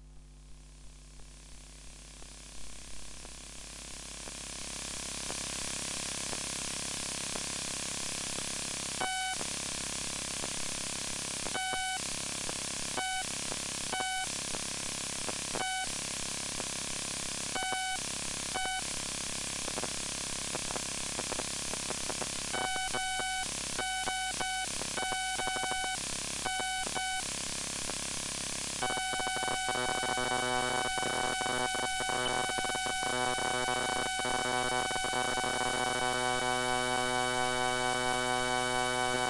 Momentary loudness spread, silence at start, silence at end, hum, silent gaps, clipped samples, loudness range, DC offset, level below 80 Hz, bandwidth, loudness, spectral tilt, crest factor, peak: 7 LU; 0 s; 0 s; none; none; under 0.1%; 6 LU; under 0.1%; -54 dBFS; 11.5 kHz; -33 LUFS; -1 dB/octave; 18 dB; -16 dBFS